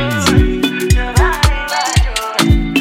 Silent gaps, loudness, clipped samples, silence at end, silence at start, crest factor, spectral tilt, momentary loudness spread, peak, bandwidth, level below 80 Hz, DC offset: none; -14 LUFS; under 0.1%; 0 s; 0 s; 12 dB; -4.5 dB/octave; 4 LU; 0 dBFS; 16.5 kHz; -18 dBFS; under 0.1%